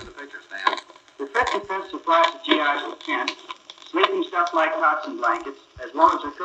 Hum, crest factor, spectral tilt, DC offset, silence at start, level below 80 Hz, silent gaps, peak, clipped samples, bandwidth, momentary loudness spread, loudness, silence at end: none; 22 dB; -2.5 dB/octave; under 0.1%; 0 s; -60 dBFS; none; -2 dBFS; under 0.1%; 8.6 kHz; 18 LU; -22 LUFS; 0 s